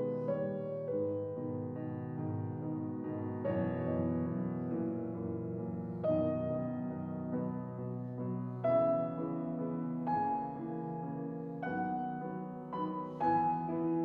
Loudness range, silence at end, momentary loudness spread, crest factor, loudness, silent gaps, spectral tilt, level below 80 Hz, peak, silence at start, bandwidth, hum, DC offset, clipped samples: 3 LU; 0 s; 8 LU; 16 dB; -37 LUFS; none; -11.5 dB/octave; -70 dBFS; -20 dBFS; 0 s; 4.5 kHz; none; under 0.1%; under 0.1%